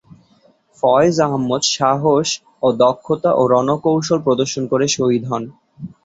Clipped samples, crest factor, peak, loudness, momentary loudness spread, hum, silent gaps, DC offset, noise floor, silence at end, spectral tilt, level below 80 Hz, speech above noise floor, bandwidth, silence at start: under 0.1%; 16 dB; -2 dBFS; -16 LUFS; 8 LU; none; none; under 0.1%; -55 dBFS; 0.15 s; -4.5 dB/octave; -56 dBFS; 39 dB; 8 kHz; 0.85 s